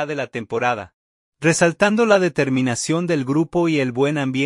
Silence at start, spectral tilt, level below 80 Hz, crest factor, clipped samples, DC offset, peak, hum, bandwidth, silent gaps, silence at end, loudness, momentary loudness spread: 0 s; -5 dB/octave; -58 dBFS; 18 dB; under 0.1%; under 0.1%; -2 dBFS; none; 11.5 kHz; 0.94-1.32 s; 0 s; -19 LUFS; 7 LU